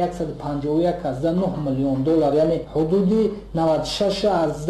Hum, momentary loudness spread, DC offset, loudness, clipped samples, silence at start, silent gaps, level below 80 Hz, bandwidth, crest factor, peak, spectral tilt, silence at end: none; 5 LU; under 0.1%; -21 LUFS; under 0.1%; 0 s; none; -42 dBFS; 12.5 kHz; 12 dB; -10 dBFS; -7 dB/octave; 0 s